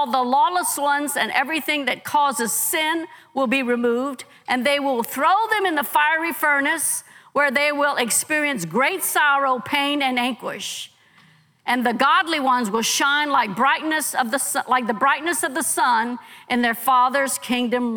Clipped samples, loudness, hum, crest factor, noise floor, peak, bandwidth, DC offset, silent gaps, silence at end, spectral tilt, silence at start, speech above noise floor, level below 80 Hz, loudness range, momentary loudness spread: under 0.1%; -20 LUFS; none; 18 dB; -55 dBFS; -4 dBFS; over 20 kHz; under 0.1%; none; 0 s; -1.5 dB/octave; 0 s; 34 dB; -76 dBFS; 2 LU; 7 LU